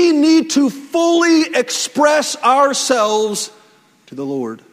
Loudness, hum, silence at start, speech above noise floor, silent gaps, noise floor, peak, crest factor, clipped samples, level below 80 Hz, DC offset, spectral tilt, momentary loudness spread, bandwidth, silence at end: -15 LUFS; none; 0 s; 35 dB; none; -50 dBFS; 0 dBFS; 14 dB; under 0.1%; -66 dBFS; under 0.1%; -2.5 dB/octave; 12 LU; 16 kHz; 0.15 s